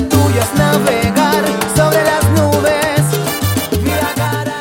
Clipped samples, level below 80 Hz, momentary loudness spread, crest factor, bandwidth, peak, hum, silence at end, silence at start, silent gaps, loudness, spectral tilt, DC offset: under 0.1%; -34 dBFS; 4 LU; 12 dB; 17.5 kHz; 0 dBFS; none; 0 s; 0 s; none; -13 LUFS; -5 dB/octave; under 0.1%